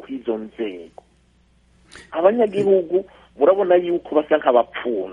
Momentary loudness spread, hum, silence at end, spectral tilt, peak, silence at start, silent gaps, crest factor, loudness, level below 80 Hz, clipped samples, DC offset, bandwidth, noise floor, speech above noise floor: 12 LU; none; 0 s; -7 dB/octave; -2 dBFS; 0.1 s; none; 18 dB; -19 LUFS; -58 dBFS; under 0.1%; under 0.1%; 9.6 kHz; -57 dBFS; 38 dB